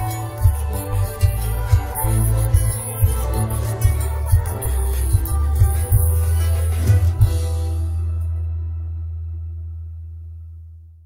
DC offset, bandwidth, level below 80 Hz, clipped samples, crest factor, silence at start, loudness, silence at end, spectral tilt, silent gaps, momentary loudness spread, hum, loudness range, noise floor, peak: under 0.1%; 16.5 kHz; -22 dBFS; under 0.1%; 16 dB; 0 s; -20 LUFS; 0.1 s; -6 dB/octave; none; 14 LU; none; 5 LU; -39 dBFS; -2 dBFS